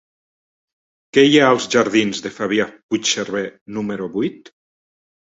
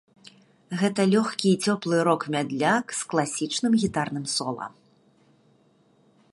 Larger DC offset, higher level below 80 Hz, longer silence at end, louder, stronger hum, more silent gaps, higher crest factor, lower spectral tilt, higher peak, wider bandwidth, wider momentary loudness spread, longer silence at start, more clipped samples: neither; about the same, -60 dBFS vs -64 dBFS; second, 1.05 s vs 1.65 s; first, -18 LUFS vs -25 LUFS; neither; first, 2.83-2.89 s, 3.61-3.66 s vs none; about the same, 18 dB vs 20 dB; about the same, -3.5 dB/octave vs -4.5 dB/octave; first, -2 dBFS vs -6 dBFS; second, 8 kHz vs 11.5 kHz; first, 13 LU vs 6 LU; first, 1.15 s vs 0.7 s; neither